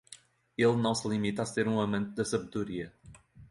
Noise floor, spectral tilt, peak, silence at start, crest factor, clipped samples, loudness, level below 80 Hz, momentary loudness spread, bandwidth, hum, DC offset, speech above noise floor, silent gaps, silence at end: -56 dBFS; -5.5 dB/octave; -14 dBFS; 0.1 s; 18 dB; under 0.1%; -31 LUFS; -62 dBFS; 17 LU; 11.5 kHz; none; under 0.1%; 26 dB; none; 0.05 s